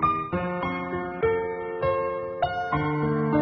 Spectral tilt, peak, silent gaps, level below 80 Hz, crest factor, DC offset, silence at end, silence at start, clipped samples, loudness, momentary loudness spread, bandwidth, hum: -6 dB/octave; -10 dBFS; none; -48 dBFS; 16 dB; under 0.1%; 0 s; 0 s; under 0.1%; -27 LUFS; 5 LU; 6 kHz; none